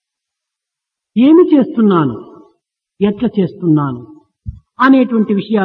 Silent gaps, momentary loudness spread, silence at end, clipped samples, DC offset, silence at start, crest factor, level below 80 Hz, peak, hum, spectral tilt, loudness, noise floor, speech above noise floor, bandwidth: none; 22 LU; 0 s; under 0.1%; under 0.1%; 1.15 s; 14 dB; -46 dBFS; 0 dBFS; none; -10 dB/octave; -12 LUFS; -82 dBFS; 70 dB; 5.2 kHz